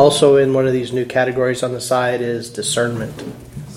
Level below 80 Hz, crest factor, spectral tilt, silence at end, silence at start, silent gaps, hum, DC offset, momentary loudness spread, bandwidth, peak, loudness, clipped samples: -50 dBFS; 16 dB; -4.5 dB/octave; 0 s; 0 s; none; none; under 0.1%; 15 LU; 15.5 kHz; 0 dBFS; -17 LUFS; under 0.1%